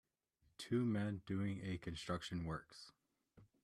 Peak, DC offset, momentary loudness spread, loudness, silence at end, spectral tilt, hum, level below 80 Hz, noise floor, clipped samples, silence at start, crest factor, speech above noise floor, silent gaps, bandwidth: -28 dBFS; under 0.1%; 17 LU; -43 LUFS; 0.2 s; -6.5 dB/octave; none; -68 dBFS; -80 dBFS; under 0.1%; 0.6 s; 16 dB; 37 dB; none; 13.5 kHz